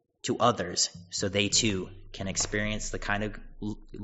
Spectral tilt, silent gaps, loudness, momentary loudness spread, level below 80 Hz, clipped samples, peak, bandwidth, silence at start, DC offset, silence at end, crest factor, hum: -3 dB/octave; none; -29 LUFS; 14 LU; -44 dBFS; under 0.1%; -8 dBFS; 8 kHz; 0.25 s; under 0.1%; 0 s; 22 dB; none